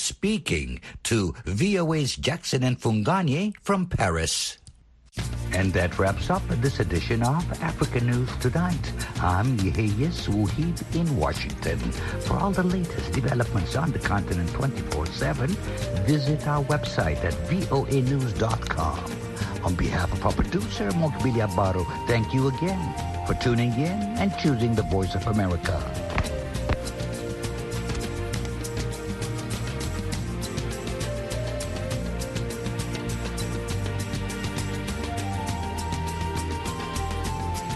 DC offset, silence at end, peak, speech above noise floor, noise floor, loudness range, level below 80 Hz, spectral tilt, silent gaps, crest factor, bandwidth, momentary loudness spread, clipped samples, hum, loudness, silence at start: under 0.1%; 0 s; -8 dBFS; 27 dB; -52 dBFS; 5 LU; -36 dBFS; -5.5 dB/octave; none; 18 dB; 12.5 kHz; 7 LU; under 0.1%; none; -27 LUFS; 0 s